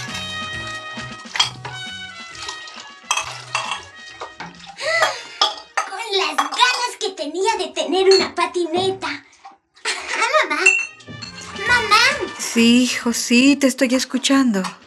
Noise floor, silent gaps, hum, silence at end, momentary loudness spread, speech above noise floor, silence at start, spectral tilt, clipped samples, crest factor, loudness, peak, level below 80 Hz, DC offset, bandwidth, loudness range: -46 dBFS; none; none; 0.1 s; 18 LU; 29 dB; 0 s; -2.5 dB/octave; under 0.1%; 20 dB; -18 LUFS; 0 dBFS; -56 dBFS; under 0.1%; 14.5 kHz; 9 LU